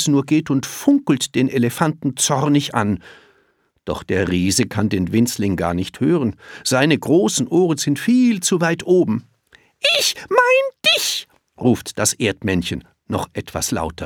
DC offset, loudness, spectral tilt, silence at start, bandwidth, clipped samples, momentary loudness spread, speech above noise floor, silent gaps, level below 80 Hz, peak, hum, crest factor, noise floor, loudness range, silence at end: under 0.1%; -18 LUFS; -4 dB/octave; 0 s; over 20 kHz; under 0.1%; 10 LU; 44 dB; none; -48 dBFS; 0 dBFS; none; 18 dB; -62 dBFS; 3 LU; 0 s